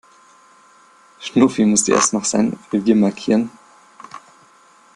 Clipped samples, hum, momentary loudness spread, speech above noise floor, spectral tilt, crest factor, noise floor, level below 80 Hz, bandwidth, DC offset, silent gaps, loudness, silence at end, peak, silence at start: under 0.1%; none; 20 LU; 34 dB; -4 dB/octave; 18 dB; -50 dBFS; -60 dBFS; 11 kHz; under 0.1%; none; -17 LUFS; 0.75 s; -2 dBFS; 1.2 s